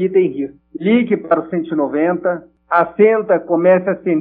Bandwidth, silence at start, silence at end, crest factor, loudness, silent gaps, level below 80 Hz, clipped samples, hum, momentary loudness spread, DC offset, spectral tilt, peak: 4.1 kHz; 0 s; 0 s; 14 dB; -16 LUFS; none; -60 dBFS; under 0.1%; none; 9 LU; under 0.1%; -6 dB/octave; 0 dBFS